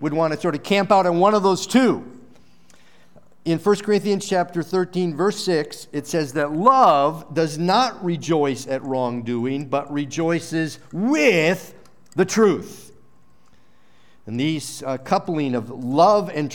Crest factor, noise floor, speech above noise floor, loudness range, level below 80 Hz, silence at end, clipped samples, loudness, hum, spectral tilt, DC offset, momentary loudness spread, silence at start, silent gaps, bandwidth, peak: 20 dB; -58 dBFS; 38 dB; 5 LU; -66 dBFS; 0 s; under 0.1%; -20 LUFS; none; -5.5 dB/octave; 0.5%; 11 LU; 0 s; none; 18 kHz; -2 dBFS